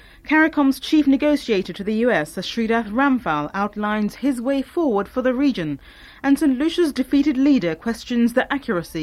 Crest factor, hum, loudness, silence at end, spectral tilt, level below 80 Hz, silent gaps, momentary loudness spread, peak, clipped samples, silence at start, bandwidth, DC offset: 14 dB; none; -20 LUFS; 0 s; -5.5 dB/octave; -48 dBFS; none; 7 LU; -6 dBFS; under 0.1%; 0.25 s; 14 kHz; under 0.1%